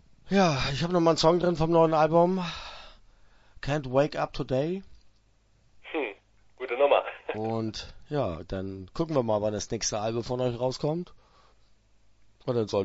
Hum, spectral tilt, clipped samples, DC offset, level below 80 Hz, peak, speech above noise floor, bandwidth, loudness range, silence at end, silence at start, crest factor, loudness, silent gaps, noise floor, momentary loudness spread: none; -5.5 dB/octave; under 0.1%; under 0.1%; -50 dBFS; -8 dBFS; 37 dB; 8 kHz; 7 LU; 0 s; 0.25 s; 20 dB; -27 LUFS; none; -63 dBFS; 14 LU